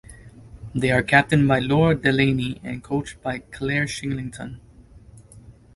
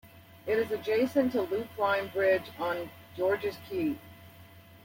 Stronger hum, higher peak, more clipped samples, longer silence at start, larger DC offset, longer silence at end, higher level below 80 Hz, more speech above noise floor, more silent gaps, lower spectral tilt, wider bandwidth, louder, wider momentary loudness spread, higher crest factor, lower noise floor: neither; first, 0 dBFS vs -14 dBFS; neither; about the same, 0.1 s vs 0.05 s; neither; first, 0.25 s vs 0.05 s; first, -46 dBFS vs -68 dBFS; about the same, 26 dB vs 23 dB; neither; about the same, -6 dB/octave vs -6 dB/octave; second, 11.5 kHz vs 16.5 kHz; first, -21 LUFS vs -30 LUFS; first, 15 LU vs 8 LU; about the same, 22 dB vs 18 dB; second, -47 dBFS vs -53 dBFS